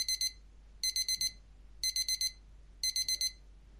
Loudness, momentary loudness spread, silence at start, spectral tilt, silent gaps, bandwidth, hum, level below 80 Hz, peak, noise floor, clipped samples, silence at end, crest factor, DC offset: -33 LUFS; 5 LU; 0 s; 2.5 dB/octave; none; 15.5 kHz; none; -56 dBFS; -20 dBFS; -55 dBFS; under 0.1%; 0 s; 18 dB; under 0.1%